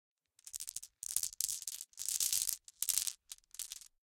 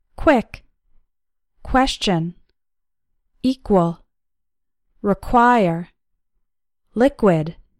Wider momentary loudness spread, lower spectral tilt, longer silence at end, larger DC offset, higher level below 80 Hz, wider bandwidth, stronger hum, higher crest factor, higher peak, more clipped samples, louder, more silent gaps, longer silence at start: about the same, 15 LU vs 15 LU; second, 3.5 dB/octave vs -6 dB/octave; about the same, 0.25 s vs 0.3 s; neither; second, -74 dBFS vs -40 dBFS; first, 17 kHz vs 13 kHz; neither; first, 32 dB vs 20 dB; second, -10 dBFS vs -2 dBFS; neither; second, -37 LUFS vs -19 LUFS; neither; first, 0.45 s vs 0.2 s